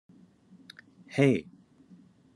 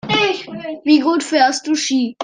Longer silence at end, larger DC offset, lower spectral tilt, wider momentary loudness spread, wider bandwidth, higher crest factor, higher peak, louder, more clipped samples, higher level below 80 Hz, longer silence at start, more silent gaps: first, 0.95 s vs 0 s; neither; first, -7 dB/octave vs -3 dB/octave; first, 26 LU vs 10 LU; first, 11 kHz vs 9.8 kHz; first, 24 dB vs 14 dB; second, -10 dBFS vs -2 dBFS; second, -27 LUFS vs -16 LUFS; neither; second, -74 dBFS vs -60 dBFS; first, 1.15 s vs 0.05 s; neither